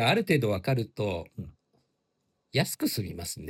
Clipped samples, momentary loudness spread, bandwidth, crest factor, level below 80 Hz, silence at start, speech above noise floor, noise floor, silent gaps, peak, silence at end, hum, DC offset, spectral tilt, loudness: under 0.1%; 16 LU; 17.5 kHz; 20 dB; -60 dBFS; 0 s; 49 dB; -77 dBFS; none; -10 dBFS; 0 s; none; under 0.1%; -5 dB/octave; -29 LUFS